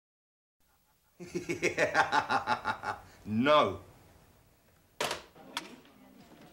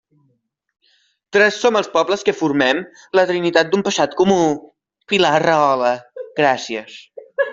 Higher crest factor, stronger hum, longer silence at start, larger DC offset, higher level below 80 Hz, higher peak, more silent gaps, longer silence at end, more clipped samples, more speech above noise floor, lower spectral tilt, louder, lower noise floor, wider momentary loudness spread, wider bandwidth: first, 22 dB vs 16 dB; neither; second, 1.2 s vs 1.35 s; neither; second, -66 dBFS vs -60 dBFS; second, -12 dBFS vs -2 dBFS; neither; about the same, 0.05 s vs 0 s; neither; second, 41 dB vs 49 dB; about the same, -4 dB/octave vs -4 dB/octave; second, -31 LUFS vs -17 LUFS; first, -70 dBFS vs -66 dBFS; first, 16 LU vs 13 LU; first, 16 kHz vs 7.8 kHz